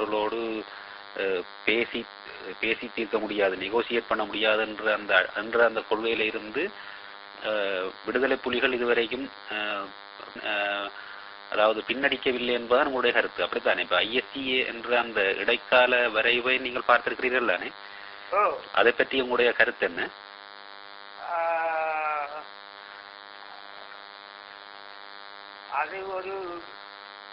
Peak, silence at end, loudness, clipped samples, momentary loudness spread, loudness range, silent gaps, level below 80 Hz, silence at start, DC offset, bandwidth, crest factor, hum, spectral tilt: -4 dBFS; 0 s; -26 LUFS; under 0.1%; 20 LU; 12 LU; none; -64 dBFS; 0 s; under 0.1%; 5.8 kHz; 24 dB; none; -7 dB/octave